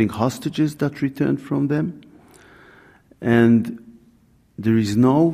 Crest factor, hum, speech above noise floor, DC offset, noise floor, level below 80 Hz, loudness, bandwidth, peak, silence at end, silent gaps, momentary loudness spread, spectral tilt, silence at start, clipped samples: 16 dB; none; 37 dB; under 0.1%; -56 dBFS; -56 dBFS; -20 LUFS; 15 kHz; -4 dBFS; 0 s; none; 12 LU; -7.5 dB/octave; 0 s; under 0.1%